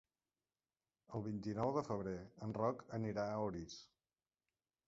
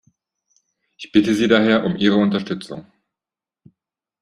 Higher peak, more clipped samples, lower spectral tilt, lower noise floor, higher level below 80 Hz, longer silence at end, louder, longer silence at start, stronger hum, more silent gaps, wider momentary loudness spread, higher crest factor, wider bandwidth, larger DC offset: second, -24 dBFS vs -2 dBFS; neither; about the same, -7 dB/octave vs -6 dB/octave; about the same, under -90 dBFS vs -89 dBFS; second, -70 dBFS vs -58 dBFS; second, 1.05 s vs 1.4 s; second, -43 LUFS vs -18 LUFS; about the same, 1.1 s vs 1 s; neither; neither; second, 10 LU vs 20 LU; about the same, 20 dB vs 20 dB; second, 7.6 kHz vs 11 kHz; neither